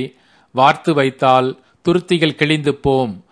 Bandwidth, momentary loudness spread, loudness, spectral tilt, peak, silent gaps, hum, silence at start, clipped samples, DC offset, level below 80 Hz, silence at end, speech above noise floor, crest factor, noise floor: 10.5 kHz; 10 LU; -16 LUFS; -6 dB/octave; 0 dBFS; none; none; 0 s; under 0.1%; under 0.1%; -48 dBFS; 0.1 s; 21 dB; 16 dB; -36 dBFS